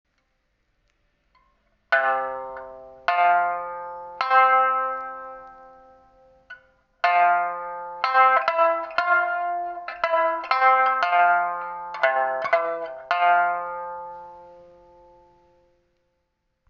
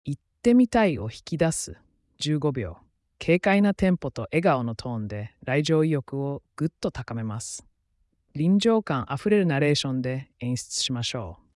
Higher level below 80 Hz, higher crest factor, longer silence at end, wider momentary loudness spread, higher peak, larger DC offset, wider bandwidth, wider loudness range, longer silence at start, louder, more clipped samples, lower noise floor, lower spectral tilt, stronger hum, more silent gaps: second, -68 dBFS vs -54 dBFS; about the same, 18 dB vs 16 dB; first, 2.15 s vs 0.2 s; first, 17 LU vs 12 LU; first, -6 dBFS vs -10 dBFS; neither; second, 6.6 kHz vs 12 kHz; about the same, 6 LU vs 4 LU; first, 1.9 s vs 0.05 s; first, -22 LUFS vs -25 LUFS; neither; first, -74 dBFS vs -70 dBFS; second, 1.5 dB/octave vs -5.5 dB/octave; neither; neither